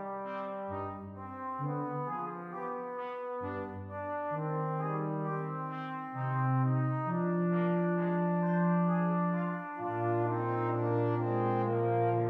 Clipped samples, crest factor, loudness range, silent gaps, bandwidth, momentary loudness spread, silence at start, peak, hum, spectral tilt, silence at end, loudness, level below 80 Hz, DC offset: under 0.1%; 12 dB; 8 LU; none; 3.9 kHz; 9 LU; 0 s; -20 dBFS; none; -11 dB/octave; 0 s; -33 LUFS; -74 dBFS; under 0.1%